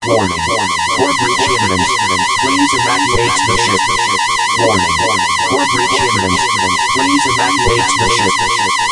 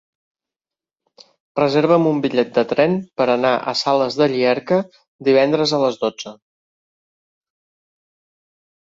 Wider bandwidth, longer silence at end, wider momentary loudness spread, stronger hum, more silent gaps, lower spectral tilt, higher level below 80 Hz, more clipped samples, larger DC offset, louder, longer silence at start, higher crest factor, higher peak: first, 11.5 kHz vs 7.8 kHz; second, 0 s vs 2.6 s; second, 1 LU vs 9 LU; neither; second, none vs 5.08-5.19 s; second, -2.5 dB/octave vs -5.5 dB/octave; first, -38 dBFS vs -62 dBFS; neither; neither; first, -12 LUFS vs -18 LUFS; second, 0 s vs 1.55 s; second, 12 dB vs 18 dB; about the same, 0 dBFS vs -2 dBFS